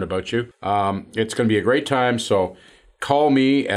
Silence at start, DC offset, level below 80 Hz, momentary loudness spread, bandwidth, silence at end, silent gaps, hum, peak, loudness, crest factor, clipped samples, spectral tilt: 0 s; under 0.1%; -58 dBFS; 8 LU; 12.5 kHz; 0 s; none; none; -4 dBFS; -20 LUFS; 16 dB; under 0.1%; -5.5 dB/octave